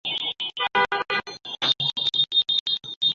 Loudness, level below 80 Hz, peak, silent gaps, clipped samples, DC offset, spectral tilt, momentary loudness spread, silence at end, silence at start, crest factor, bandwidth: -22 LUFS; -66 dBFS; -10 dBFS; 2.60-2.66 s, 2.96-3.01 s; under 0.1%; under 0.1%; -2 dB/octave; 8 LU; 0 s; 0.05 s; 16 dB; 7.8 kHz